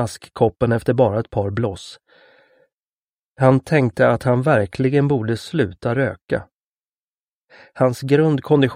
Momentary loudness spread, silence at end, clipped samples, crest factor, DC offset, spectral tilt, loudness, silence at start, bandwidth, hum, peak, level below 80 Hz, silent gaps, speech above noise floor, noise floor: 9 LU; 0 s; under 0.1%; 20 dB; under 0.1%; -7.5 dB/octave; -19 LUFS; 0 s; 15 kHz; none; 0 dBFS; -50 dBFS; 2.73-3.35 s, 6.21-6.26 s, 6.53-6.92 s, 6.99-7.48 s; over 72 dB; under -90 dBFS